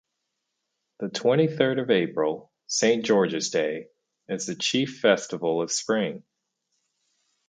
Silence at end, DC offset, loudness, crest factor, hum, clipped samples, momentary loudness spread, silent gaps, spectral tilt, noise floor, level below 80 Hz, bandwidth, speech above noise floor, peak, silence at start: 1.3 s; under 0.1%; -25 LUFS; 22 dB; none; under 0.1%; 11 LU; none; -4 dB/octave; -80 dBFS; -74 dBFS; 9.4 kHz; 56 dB; -4 dBFS; 1 s